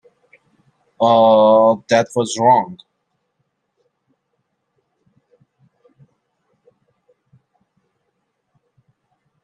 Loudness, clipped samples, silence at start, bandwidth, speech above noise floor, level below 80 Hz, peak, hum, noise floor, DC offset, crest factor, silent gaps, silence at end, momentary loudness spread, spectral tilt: -14 LUFS; under 0.1%; 1 s; 10.5 kHz; 58 dB; -68 dBFS; -2 dBFS; none; -71 dBFS; under 0.1%; 18 dB; none; 6.7 s; 9 LU; -5 dB/octave